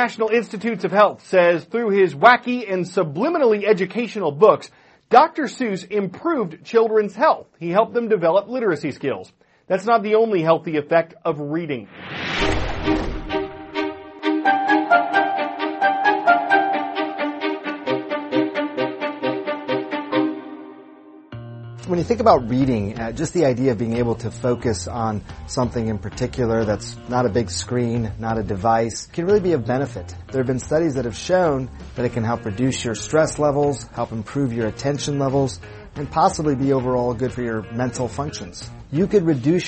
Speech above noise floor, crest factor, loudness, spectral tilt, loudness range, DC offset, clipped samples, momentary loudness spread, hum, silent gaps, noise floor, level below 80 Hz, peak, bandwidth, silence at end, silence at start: 25 dB; 20 dB; -20 LUFS; -6 dB/octave; 5 LU; under 0.1%; under 0.1%; 10 LU; none; none; -44 dBFS; -42 dBFS; 0 dBFS; 8.8 kHz; 0 s; 0 s